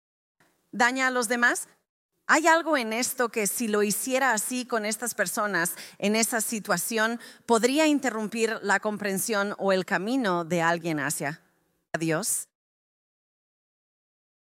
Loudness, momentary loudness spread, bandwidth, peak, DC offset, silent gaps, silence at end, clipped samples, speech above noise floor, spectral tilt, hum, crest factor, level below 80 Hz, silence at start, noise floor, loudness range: -25 LUFS; 8 LU; 16.5 kHz; -6 dBFS; under 0.1%; 1.89-2.09 s; 2.1 s; under 0.1%; 44 dB; -3 dB/octave; none; 22 dB; -76 dBFS; 0.75 s; -70 dBFS; 5 LU